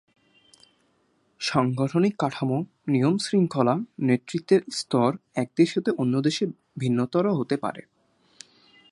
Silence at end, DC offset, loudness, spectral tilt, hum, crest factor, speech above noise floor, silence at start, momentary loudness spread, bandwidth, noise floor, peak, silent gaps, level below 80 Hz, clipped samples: 1.1 s; under 0.1%; -25 LUFS; -6.5 dB/octave; none; 20 dB; 43 dB; 1.4 s; 7 LU; 11.5 kHz; -67 dBFS; -6 dBFS; none; -68 dBFS; under 0.1%